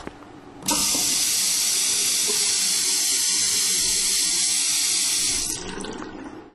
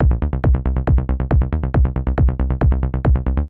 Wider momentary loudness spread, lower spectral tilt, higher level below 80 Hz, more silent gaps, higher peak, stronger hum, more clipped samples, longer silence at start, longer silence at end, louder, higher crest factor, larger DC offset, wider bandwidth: first, 12 LU vs 1 LU; second, 1 dB/octave vs -11.5 dB/octave; second, -50 dBFS vs -18 dBFS; neither; about the same, -6 dBFS vs -4 dBFS; neither; neither; about the same, 0 s vs 0 s; about the same, 0.05 s vs 0 s; about the same, -19 LUFS vs -19 LUFS; about the same, 16 dB vs 12 dB; neither; first, 13 kHz vs 3.3 kHz